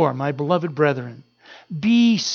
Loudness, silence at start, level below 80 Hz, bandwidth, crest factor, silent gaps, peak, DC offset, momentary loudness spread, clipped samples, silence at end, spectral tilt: -20 LUFS; 0 s; -68 dBFS; 7 kHz; 16 dB; none; -4 dBFS; under 0.1%; 15 LU; under 0.1%; 0 s; -5.5 dB/octave